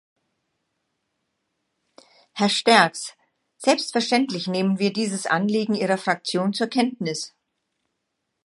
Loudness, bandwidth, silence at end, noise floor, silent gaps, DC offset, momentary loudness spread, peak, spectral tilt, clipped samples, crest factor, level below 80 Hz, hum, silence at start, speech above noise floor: -22 LUFS; 11.5 kHz; 1.2 s; -78 dBFS; none; under 0.1%; 12 LU; -2 dBFS; -4 dB/octave; under 0.1%; 24 dB; -76 dBFS; none; 2.35 s; 56 dB